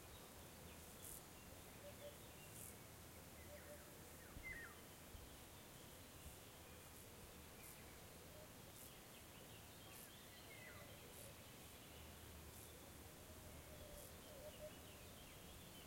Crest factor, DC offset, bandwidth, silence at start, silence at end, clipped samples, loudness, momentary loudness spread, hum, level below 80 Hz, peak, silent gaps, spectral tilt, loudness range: 18 dB; under 0.1%; 16.5 kHz; 0 s; 0 s; under 0.1%; -58 LUFS; 3 LU; none; -70 dBFS; -42 dBFS; none; -3 dB/octave; 2 LU